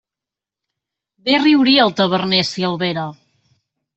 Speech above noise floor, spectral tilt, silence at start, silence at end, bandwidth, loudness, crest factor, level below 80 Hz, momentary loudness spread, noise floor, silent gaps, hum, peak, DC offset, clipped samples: 72 dB; -5 dB/octave; 1.25 s; 0.85 s; 8.2 kHz; -15 LUFS; 16 dB; -60 dBFS; 13 LU; -87 dBFS; none; none; -2 dBFS; under 0.1%; under 0.1%